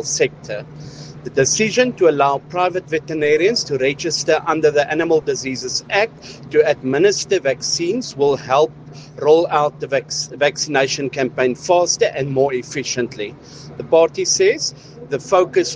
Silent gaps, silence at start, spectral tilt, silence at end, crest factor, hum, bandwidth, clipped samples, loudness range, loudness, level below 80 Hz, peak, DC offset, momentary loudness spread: none; 0 s; -3.5 dB/octave; 0 s; 18 dB; none; 10 kHz; under 0.1%; 2 LU; -17 LUFS; -56 dBFS; 0 dBFS; under 0.1%; 12 LU